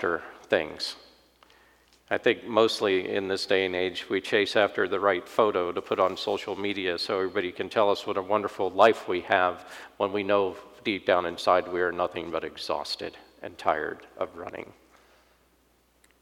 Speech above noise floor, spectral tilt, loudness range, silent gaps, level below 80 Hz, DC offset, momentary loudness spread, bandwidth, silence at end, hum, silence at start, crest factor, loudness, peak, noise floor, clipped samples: 38 dB; -4 dB/octave; 7 LU; none; -66 dBFS; under 0.1%; 11 LU; 16 kHz; 1.55 s; none; 0 s; 22 dB; -27 LUFS; -6 dBFS; -65 dBFS; under 0.1%